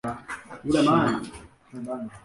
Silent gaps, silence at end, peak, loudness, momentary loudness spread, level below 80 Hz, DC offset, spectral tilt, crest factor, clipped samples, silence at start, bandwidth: none; 0.05 s; -8 dBFS; -25 LUFS; 19 LU; -54 dBFS; under 0.1%; -6 dB/octave; 18 dB; under 0.1%; 0.05 s; 11.5 kHz